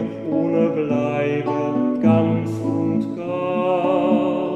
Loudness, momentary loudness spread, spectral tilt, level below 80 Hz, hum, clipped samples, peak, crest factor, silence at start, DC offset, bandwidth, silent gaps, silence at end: -20 LUFS; 6 LU; -9 dB/octave; -62 dBFS; none; under 0.1%; -4 dBFS; 16 dB; 0 s; under 0.1%; 8.6 kHz; none; 0 s